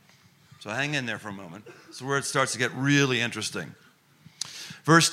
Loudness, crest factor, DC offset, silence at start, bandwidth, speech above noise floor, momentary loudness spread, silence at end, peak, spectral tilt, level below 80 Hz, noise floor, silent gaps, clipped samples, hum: -26 LUFS; 24 dB; under 0.1%; 0.6 s; 16 kHz; 32 dB; 21 LU; 0 s; -4 dBFS; -3.5 dB/octave; -70 dBFS; -58 dBFS; none; under 0.1%; none